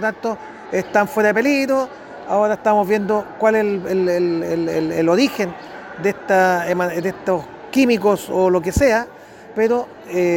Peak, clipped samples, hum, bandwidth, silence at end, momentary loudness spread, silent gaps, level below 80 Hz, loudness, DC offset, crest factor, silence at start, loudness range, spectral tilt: -4 dBFS; under 0.1%; none; 17 kHz; 0 s; 9 LU; none; -42 dBFS; -18 LUFS; under 0.1%; 14 dB; 0 s; 1 LU; -5.5 dB/octave